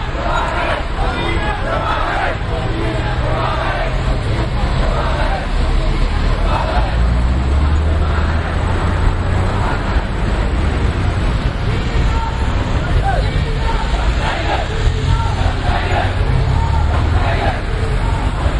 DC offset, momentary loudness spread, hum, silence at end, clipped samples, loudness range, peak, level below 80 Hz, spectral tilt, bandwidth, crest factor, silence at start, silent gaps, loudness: under 0.1%; 3 LU; none; 0 s; under 0.1%; 2 LU; -2 dBFS; -18 dBFS; -6.5 dB/octave; 11 kHz; 14 dB; 0 s; none; -18 LUFS